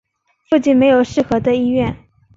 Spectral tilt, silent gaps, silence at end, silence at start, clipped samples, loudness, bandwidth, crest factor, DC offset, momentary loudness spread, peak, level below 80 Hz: -6.5 dB/octave; none; 0.4 s; 0.5 s; under 0.1%; -15 LUFS; 7.8 kHz; 14 dB; under 0.1%; 7 LU; -2 dBFS; -44 dBFS